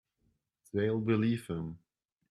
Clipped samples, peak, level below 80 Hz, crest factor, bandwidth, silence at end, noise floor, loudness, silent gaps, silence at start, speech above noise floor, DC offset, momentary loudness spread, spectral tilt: under 0.1%; -18 dBFS; -66 dBFS; 18 dB; 13 kHz; 0.55 s; -77 dBFS; -33 LUFS; none; 0.75 s; 46 dB; under 0.1%; 13 LU; -8 dB/octave